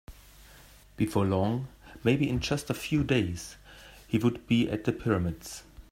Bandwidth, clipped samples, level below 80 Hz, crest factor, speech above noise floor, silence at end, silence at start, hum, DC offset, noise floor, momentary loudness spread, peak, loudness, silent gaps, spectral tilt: 16 kHz; under 0.1%; -50 dBFS; 18 dB; 26 dB; 0.1 s; 0.1 s; none; under 0.1%; -54 dBFS; 17 LU; -12 dBFS; -29 LUFS; none; -6 dB/octave